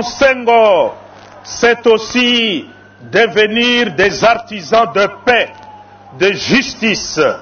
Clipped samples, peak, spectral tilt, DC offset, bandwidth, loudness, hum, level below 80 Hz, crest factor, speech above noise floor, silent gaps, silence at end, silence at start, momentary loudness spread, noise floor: under 0.1%; 0 dBFS; -3.5 dB/octave; under 0.1%; 6.8 kHz; -12 LUFS; none; -46 dBFS; 14 dB; 24 dB; none; 0 s; 0 s; 6 LU; -36 dBFS